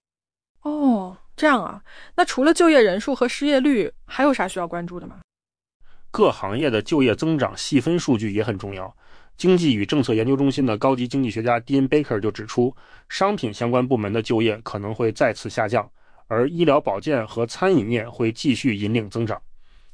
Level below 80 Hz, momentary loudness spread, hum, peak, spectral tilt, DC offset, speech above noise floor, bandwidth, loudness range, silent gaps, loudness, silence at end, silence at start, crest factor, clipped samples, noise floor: -52 dBFS; 11 LU; none; -6 dBFS; -6 dB/octave; under 0.1%; over 69 dB; 10.5 kHz; 4 LU; 5.24-5.29 s, 5.74-5.80 s; -21 LUFS; 0.25 s; 0.65 s; 16 dB; under 0.1%; under -90 dBFS